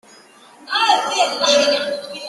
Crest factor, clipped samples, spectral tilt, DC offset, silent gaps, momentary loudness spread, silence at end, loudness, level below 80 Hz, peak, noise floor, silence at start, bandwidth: 18 dB; under 0.1%; -0.5 dB/octave; under 0.1%; none; 8 LU; 0 s; -16 LUFS; -68 dBFS; -2 dBFS; -46 dBFS; 0.6 s; 12.5 kHz